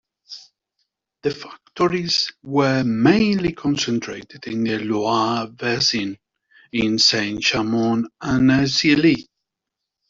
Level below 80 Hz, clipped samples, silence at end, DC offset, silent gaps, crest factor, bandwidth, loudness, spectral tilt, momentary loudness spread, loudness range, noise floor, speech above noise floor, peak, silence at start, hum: -52 dBFS; under 0.1%; 0.85 s; under 0.1%; none; 18 dB; 7.8 kHz; -19 LUFS; -4.5 dB/octave; 14 LU; 4 LU; -83 dBFS; 63 dB; -4 dBFS; 0.3 s; none